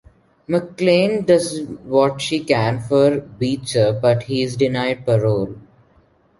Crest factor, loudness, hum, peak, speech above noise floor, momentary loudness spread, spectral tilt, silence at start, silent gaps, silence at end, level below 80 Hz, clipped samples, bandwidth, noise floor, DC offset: 18 dB; -18 LUFS; none; -2 dBFS; 38 dB; 7 LU; -6 dB/octave; 0.5 s; none; 0.8 s; -52 dBFS; under 0.1%; 11.5 kHz; -56 dBFS; under 0.1%